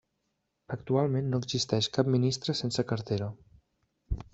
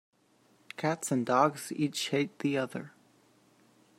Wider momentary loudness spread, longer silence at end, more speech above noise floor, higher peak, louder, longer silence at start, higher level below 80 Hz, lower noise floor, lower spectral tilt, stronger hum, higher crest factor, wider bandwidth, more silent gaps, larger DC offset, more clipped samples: about the same, 13 LU vs 14 LU; second, 0.1 s vs 1.1 s; first, 51 dB vs 36 dB; about the same, -10 dBFS vs -10 dBFS; about the same, -30 LUFS vs -31 LUFS; about the same, 0.7 s vs 0.8 s; first, -48 dBFS vs -78 dBFS; first, -80 dBFS vs -67 dBFS; about the same, -5.5 dB/octave vs -4.5 dB/octave; neither; about the same, 20 dB vs 24 dB; second, 8 kHz vs 16 kHz; neither; neither; neither